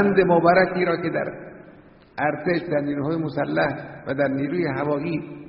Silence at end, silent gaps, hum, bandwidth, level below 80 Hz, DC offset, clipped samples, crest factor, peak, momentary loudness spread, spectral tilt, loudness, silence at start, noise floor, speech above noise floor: 0 s; none; none; 5.6 kHz; -56 dBFS; under 0.1%; under 0.1%; 18 dB; -4 dBFS; 13 LU; -5.5 dB/octave; -23 LUFS; 0 s; -48 dBFS; 27 dB